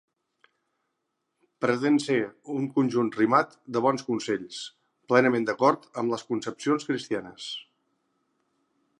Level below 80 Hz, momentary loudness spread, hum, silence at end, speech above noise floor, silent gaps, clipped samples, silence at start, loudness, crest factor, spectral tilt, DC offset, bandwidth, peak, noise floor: -76 dBFS; 13 LU; none; 1.35 s; 54 dB; none; under 0.1%; 1.6 s; -26 LUFS; 24 dB; -5.5 dB/octave; under 0.1%; 11 kHz; -4 dBFS; -80 dBFS